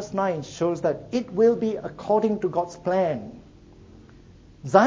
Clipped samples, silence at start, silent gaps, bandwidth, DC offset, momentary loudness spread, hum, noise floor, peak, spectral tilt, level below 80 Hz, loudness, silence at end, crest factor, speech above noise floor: under 0.1%; 0 s; none; 7.8 kHz; under 0.1%; 10 LU; none; -49 dBFS; -2 dBFS; -6.5 dB/octave; -56 dBFS; -25 LUFS; 0 s; 22 dB; 25 dB